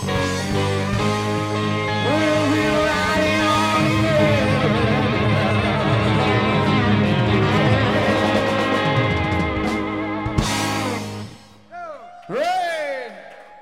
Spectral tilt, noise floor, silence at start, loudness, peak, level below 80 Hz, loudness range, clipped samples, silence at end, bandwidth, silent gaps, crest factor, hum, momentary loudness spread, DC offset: -5.5 dB/octave; -41 dBFS; 0 s; -19 LUFS; -4 dBFS; -38 dBFS; 7 LU; under 0.1%; 0 s; 15.5 kHz; none; 16 dB; none; 10 LU; 0.2%